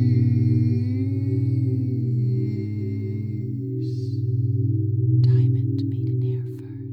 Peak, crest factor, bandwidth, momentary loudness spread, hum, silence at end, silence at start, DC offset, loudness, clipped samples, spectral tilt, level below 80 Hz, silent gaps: -10 dBFS; 12 dB; 4.8 kHz; 9 LU; none; 0 s; 0 s; under 0.1%; -23 LUFS; under 0.1%; -11.5 dB/octave; -58 dBFS; none